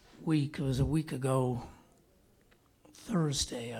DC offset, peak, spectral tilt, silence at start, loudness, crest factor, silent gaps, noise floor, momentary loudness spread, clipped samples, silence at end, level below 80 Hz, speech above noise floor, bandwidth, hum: under 0.1%; -18 dBFS; -5.5 dB/octave; 0.2 s; -32 LUFS; 16 dB; none; -66 dBFS; 9 LU; under 0.1%; 0 s; -52 dBFS; 34 dB; 15.5 kHz; none